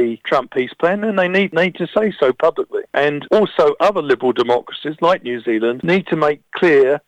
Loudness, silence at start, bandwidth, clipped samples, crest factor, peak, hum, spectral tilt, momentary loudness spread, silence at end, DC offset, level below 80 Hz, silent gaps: -17 LUFS; 0 s; 9 kHz; under 0.1%; 14 dB; -2 dBFS; none; -6.5 dB/octave; 5 LU; 0.1 s; under 0.1%; -58 dBFS; none